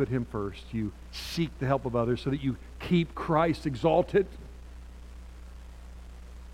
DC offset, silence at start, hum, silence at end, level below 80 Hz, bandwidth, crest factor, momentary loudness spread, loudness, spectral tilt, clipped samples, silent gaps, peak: under 0.1%; 0 s; none; 0 s; -46 dBFS; 15.5 kHz; 20 dB; 22 LU; -29 LUFS; -7 dB/octave; under 0.1%; none; -10 dBFS